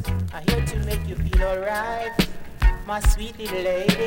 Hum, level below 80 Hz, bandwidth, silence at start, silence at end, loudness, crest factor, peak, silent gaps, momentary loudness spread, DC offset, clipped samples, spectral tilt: none; -26 dBFS; 17 kHz; 0 s; 0 s; -25 LUFS; 20 dB; -2 dBFS; none; 4 LU; under 0.1%; under 0.1%; -5.5 dB/octave